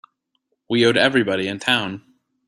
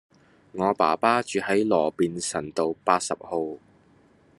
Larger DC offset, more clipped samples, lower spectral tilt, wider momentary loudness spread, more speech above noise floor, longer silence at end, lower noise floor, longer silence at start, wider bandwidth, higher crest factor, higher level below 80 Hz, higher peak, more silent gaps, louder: neither; neither; about the same, -4.5 dB/octave vs -4 dB/octave; first, 12 LU vs 9 LU; first, 53 dB vs 34 dB; second, 0.5 s vs 0.8 s; first, -72 dBFS vs -58 dBFS; first, 0.7 s vs 0.55 s; about the same, 12.5 kHz vs 12 kHz; about the same, 20 dB vs 22 dB; first, -62 dBFS vs -68 dBFS; about the same, -2 dBFS vs -4 dBFS; neither; first, -18 LUFS vs -25 LUFS